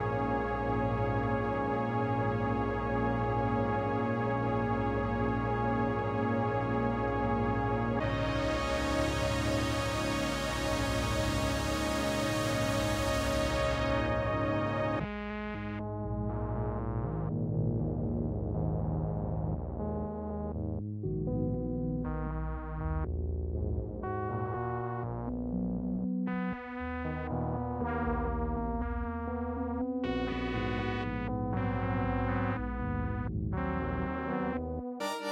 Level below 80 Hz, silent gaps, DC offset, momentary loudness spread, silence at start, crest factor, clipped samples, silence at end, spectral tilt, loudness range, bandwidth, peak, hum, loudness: -42 dBFS; none; under 0.1%; 6 LU; 0 s; 16 dB; under 0.1%; 0 s; -6.5 dB/octave; 4 LU; 16 kHz; -16 dBFS; none; -33 LUFS